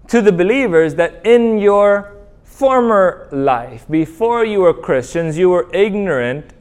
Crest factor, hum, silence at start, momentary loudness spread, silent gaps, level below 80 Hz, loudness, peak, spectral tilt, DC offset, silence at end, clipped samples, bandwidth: 14 dB; none; 0.1 s; 7 LU; none; -44 dBFS; -14 LUFS; 0 dBFS; -6.5 dB/octave; under 0.1%; 0.15 s; under 0.1%; 11.5 kHz